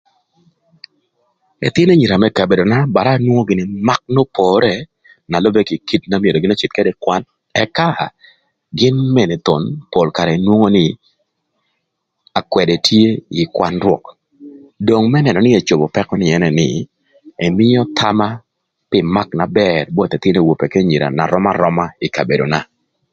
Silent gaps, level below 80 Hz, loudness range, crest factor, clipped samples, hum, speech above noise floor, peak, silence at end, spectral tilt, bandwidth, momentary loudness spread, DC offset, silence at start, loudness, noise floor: none; -46 dBFS; 3 LU; 14 dB; under 0.1%; none; 59 dB; 0 dBFS; 0.5 s; -6.5 dB/octave; 7.8 kHz; 8 LU; under 0.1%; 1.6 s; -14 LUFS; -72 dBFS